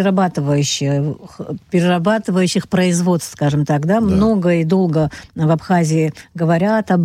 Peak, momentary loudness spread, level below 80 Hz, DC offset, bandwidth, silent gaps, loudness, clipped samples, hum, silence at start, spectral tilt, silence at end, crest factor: -4 dBFS; 6 LU; -44 dBFS; under 0.1%; 14.5 kHz; none; -16 LUFS; under 0.1%; none; 0 s; -6 dB/octave; 0 s; 12 dB